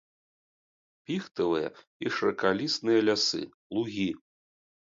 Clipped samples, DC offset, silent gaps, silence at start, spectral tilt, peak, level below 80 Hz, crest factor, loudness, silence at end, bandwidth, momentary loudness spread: under 0.1%; under 0.1%; 1.87-2.00 s, 3.54-3.70 s; 1.1 s; -4 dB/octave; -10 dBFS; -68 dBFS; 20 dB; -29 LUFS; 0.75 s; 7.8 kHz; 11 LU